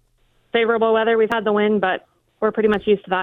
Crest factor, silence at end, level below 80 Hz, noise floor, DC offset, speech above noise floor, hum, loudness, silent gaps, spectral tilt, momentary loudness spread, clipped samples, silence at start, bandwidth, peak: 16 dB; 0 s; -54 dBFS; -61 dBFS; under 0.1%; 43 dB; none; -19 LUFS; none; -7 dB/octave; 6 LU; under 0.1%; 0.55 s; 4.1 kHz; -4 dBFS